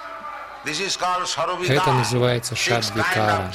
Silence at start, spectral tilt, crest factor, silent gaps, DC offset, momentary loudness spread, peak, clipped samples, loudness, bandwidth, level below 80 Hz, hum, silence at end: 0 s; -4 dB/octave; 16 dB; none; under 0.1%; 12 LU; -6 dBFS; under 0.1%; -21 LUFS; 16 kHz; -52 dBFS; none; 0 s